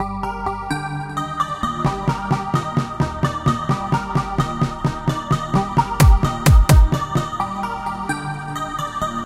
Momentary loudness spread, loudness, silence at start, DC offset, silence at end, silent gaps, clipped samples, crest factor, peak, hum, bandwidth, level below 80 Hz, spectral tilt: 10 LU; -20 LUFS; 0 s; under 0.1%; 0 s; none; under 0.1%; 18 dB; 0 dBFS; none; 16 kHz; -24 dBFS; -6 dB/octave